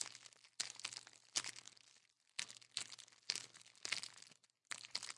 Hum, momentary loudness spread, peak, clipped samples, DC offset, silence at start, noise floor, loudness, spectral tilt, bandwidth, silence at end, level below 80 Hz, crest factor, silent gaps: none; 17 LU; -16 dBFS; under 0.1%; under 0.1%; 0 s; -73 dBFS; -47 LUFS; 1.5 dB/octave; 12 kHz; 0 s; under -90 dBFS; 34 dB; none